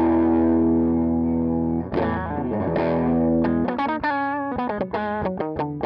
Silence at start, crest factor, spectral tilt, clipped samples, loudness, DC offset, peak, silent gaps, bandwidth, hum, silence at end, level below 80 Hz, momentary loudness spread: 0 s; 12 dB; -10.5 dB/octave; under 0.1%; -22 LUFS; under 0.1%; -10 dBFS; none; 5.4 kHz; none; 0 s; -46 dBFS; 7 LU